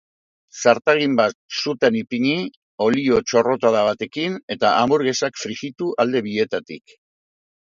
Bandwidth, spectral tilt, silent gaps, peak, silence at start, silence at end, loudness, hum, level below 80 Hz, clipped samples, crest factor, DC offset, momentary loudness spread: 7.6 kHz; -4.5 dB/octave; 1.35-1.49 s, 2.57-2.78 s, 4.43-4.48 s; 0 dBFS; 0.55 s; 1 s; -20 LUFS; none; -58 dBFS; under 0.1%; 20 dB; under 0.1%; 10 LU